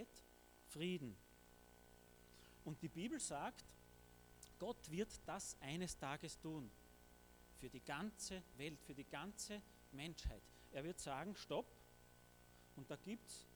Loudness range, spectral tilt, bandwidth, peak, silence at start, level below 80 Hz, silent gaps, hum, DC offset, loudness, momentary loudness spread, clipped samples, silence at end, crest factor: 3 LU; -4 dB/octave; over 20 kHz; -32 dBFS; 0 s; -64 dBFS; none; 60 Hz at -70 dBFS; under 0.1%; -51 LUFS; 19 LU; under 0.1%; 0 s; 20 dB